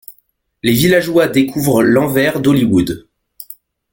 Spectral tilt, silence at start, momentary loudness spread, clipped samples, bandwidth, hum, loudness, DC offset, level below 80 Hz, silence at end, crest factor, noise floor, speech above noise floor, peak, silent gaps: -5.5 dB/octave; 0.1 s; 17 LU; under 0.1%; 17 kHz; none; -13 LUFS; under 0.1%; -44 dBFS; 0.4 s; 14 dB; -59 dBFS; 46 dB; 0 dBFS; none